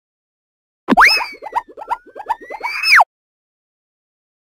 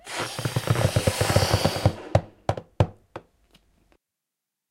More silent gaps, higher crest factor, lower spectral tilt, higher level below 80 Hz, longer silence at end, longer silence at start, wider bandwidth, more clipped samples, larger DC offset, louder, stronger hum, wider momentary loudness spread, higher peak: neither; about the same, 18 dB vs 22 dB; second, -2 dB/octave vs -5 dB/octave; second, -50 dBFS vs -42 dBFS; about the same, 1.55 s vs 1.5 s; first, 0.9 s vs 0.05 s; about the same, 16 kHz vs 16 kHz; neither; neither; first, -13 LUFS vs -25 LUFS; neither; first, 16 LU vs 10 LU; about the same, -2 dBFS vs -4 dBFS